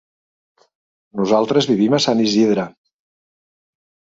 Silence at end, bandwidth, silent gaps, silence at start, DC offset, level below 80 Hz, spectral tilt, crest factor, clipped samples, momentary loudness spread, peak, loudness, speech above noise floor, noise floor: 1.45 s; 7.8 kHz; none; 1.15 s; under 0.1%; -62 dBFS; -5 dB/octave; 18 dB; under 0.1%; 10 LU; 0 dBFS; -16 LUFS; over 74 dB; under -90 dBFS